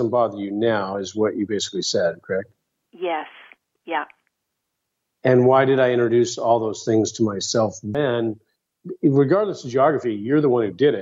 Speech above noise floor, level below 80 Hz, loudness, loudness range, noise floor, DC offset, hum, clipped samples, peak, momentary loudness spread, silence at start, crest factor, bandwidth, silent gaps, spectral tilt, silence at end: 58 dB; -66 dBFS; -21 LUFS; 8 LU; -78 dBFS; under 0.1%; none; under 0.1%; -4 dBFS; 11 LU; 0 s; 18 dB; 8 kHz; none; -5.5 dB/octave; 0 s